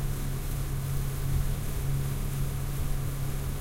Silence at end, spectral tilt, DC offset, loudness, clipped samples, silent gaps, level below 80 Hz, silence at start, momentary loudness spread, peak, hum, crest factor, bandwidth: 0 s; -5.5 dB/octave; under 0.1%; -33 LUFS; under 0.1%; none; -32 dBFS; 0 s; 3 LU; -16 dBFS; none; 14 dB; 16 kHz